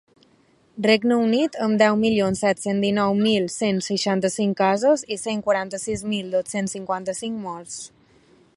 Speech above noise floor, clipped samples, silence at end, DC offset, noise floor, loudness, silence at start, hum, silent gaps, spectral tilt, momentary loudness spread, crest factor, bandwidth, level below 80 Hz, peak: 37 dB; under 0.1%; 0.7 s; under 0.1%; -59 dBFS; -22 LUFS; 0.75 s; none; none; -4.5 dB/octave; 11 LU; 20 dB; 11.5 kHz; -58 dBFS; -2 dBFS